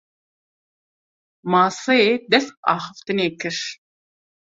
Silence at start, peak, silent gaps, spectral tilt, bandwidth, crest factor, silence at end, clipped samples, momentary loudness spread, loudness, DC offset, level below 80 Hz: 1.45 s; -2 dBFS; 2.57-2.63 s; -4 dB/octave; 8 kHz; 22 dB; 0.65 s; under 0.1%; 10 LU; -20 LUFS; under 0.1%; -66 dBFS